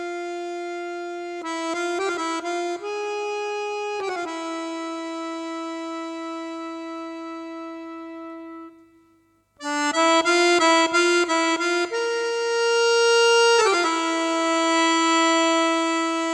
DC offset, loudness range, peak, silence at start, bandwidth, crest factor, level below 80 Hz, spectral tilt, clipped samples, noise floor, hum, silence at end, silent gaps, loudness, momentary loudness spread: under 0.1%; 14 LU; -6 dBFS; 0 s; 12.5 kHz; 16 dB; -74 dBFS; -0.5 dB/octave; under 0.1%; -61 dBFS; none; 0 s; none; -22 LUFS; 17 LU